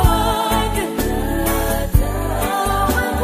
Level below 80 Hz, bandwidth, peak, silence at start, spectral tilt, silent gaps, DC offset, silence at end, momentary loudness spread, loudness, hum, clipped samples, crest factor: -22 dBFS; 15.5 kHz; 0 dBFS; 0 s; -5 dB/octave; none; under 0.1%; 0 s; 3 LU; -19 LUFS; none; under 0.1%; 16 dB